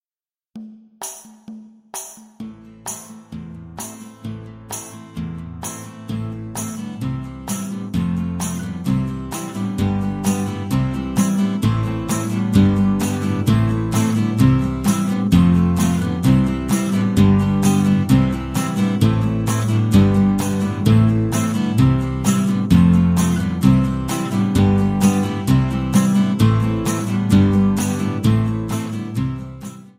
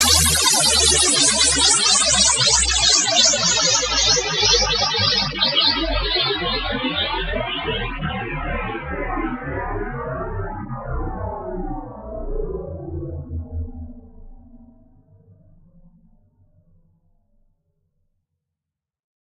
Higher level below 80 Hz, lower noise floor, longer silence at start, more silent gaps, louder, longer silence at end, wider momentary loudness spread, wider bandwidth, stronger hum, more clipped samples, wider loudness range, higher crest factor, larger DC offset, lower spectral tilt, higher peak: about the same, -36 dBFS vs -34 dBFS; first, under -90 dBFS vs -86 dBFS; first, 0.55 s vs 0 s; neither; about the same, -18 LUFS vs -16 LUFS; second, 0.1 s vs 4.7 s; about the same, 17 LU vs 18 LU; about the same, 16 kHz vs 16 kHz; neither; neither; second, 15 LU vs 19 LU; about the same, 18 dB vs 20 dB; neither; first, -6.5 dB/octave vs -1 dB/octave; about the same, 0 dBFS vs -2 dBFS